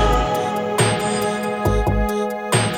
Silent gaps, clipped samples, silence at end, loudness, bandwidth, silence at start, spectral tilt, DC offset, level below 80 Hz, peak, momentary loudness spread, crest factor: none; under 0.1%; 0 s; -20 LUFS; 19 kHz; 0 s; -4.5 dB/octave; under 0.1%; -28 dBFS; -4 dBFS; 4 LU; 16 dB